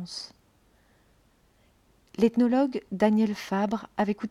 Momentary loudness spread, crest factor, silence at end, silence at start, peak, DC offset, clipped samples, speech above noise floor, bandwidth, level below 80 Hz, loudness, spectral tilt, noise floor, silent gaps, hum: 15 LU; 18 dB; 0 s; 0 s; -10 dBFS; under 0.1%; under 0.1%; 38 dB; 13 kHz; -62 dBFS; -26 LUFS; -6.5 dB/octave; -63 dBFS; none; none